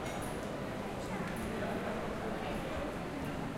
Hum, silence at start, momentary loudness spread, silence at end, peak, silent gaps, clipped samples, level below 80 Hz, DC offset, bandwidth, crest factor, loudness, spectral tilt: none; 0 s; 3 LU; 0 s; -26 dBFS; none; under 0.1%; -50 dBFS; under 0.1%; 16.5 kHz; 12 dB; -39 LUFS; -5.5 dB/octave